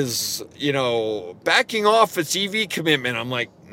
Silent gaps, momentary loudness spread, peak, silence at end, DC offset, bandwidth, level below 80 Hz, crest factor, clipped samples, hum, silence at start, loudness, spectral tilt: none; 9 LU; -2 dBFS; 0 s; under 0.1%; 17 kHz; -66 dBFS; 20 dB; under 0.1%; none; 0 s; -21 LUFS; -3 dB/octave